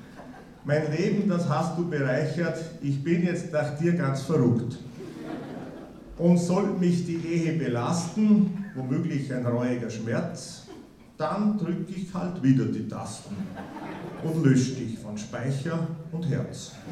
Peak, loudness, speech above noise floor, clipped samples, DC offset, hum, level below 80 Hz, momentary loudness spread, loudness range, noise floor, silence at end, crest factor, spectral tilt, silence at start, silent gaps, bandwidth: -8 dBFS; -27 LUFS; 21 dB; under 0.1%; under 0.1%; none; -58 dBFS; 16 LU; 4 LU; -47 dBFS; 0 s; 18 dB; -7 dB/octave; 0 s; none; 11.5 kHz